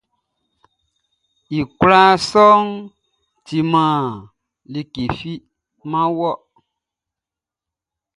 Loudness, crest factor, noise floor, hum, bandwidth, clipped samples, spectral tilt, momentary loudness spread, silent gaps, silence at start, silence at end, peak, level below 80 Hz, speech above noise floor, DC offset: -16 LUFS; 20 dB; -87 dBFS; none; 11.5 kHz; under 0.1%; -6 dB/octave; 20 LU; none; 1.5 s; 1.8 s; 0 dBFS; -50 dBFS; 72 dB; under 0.1%